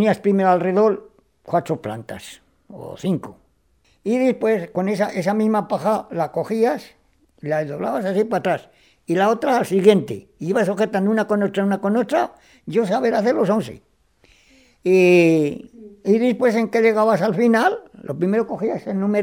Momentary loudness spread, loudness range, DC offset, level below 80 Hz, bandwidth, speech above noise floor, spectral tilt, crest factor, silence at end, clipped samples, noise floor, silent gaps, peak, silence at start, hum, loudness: 14 LU; 6 LU; under 0.1%; -62 dBFS; 16.5 kHz; 42 dB; -7 dB/octave; 20 dB; 0 s; under 0.1%; -61 dBFS; none; 0 dBFS; 0 s; none; -19 LUFS